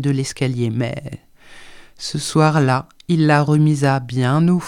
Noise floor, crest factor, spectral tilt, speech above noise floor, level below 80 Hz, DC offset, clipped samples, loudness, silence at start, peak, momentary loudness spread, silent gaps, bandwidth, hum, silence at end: -40 dBFS; 16 dB; -6.5 dB/octave; 23 dB; -52 dBFS; under 0.1%; under 0.1%; -18 LUFS; 0 s; -2 dBFS; 13 LU; none; 12 kHz; none; 0 s